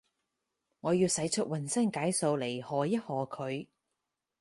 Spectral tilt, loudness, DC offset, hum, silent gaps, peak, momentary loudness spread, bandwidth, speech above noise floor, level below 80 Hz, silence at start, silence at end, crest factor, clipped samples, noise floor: -4.5 dB/octave; -32 LUFS; under 0.1%; none; none; -16 dBFS; 9 LU; 12 kHz; 55 dB; -72 dBFS; 0.85 s; 0.8 s; 16 dB; under 0.1%; -86 dBFS